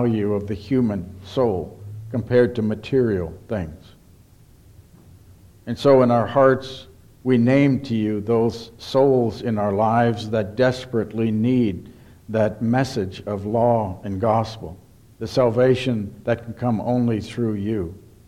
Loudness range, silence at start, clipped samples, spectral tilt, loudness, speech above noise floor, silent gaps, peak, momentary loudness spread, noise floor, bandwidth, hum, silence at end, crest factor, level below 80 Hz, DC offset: 5 LU; 0 s; under 0.1%; -7.5 dB/octave; -21 LUFS; 30 dB; none; -4 dBFS; 12 LU; -50 dBFS; 12.5 kHz; none; 0.3 s; 18 dB; -50 dBFS; under 0.1%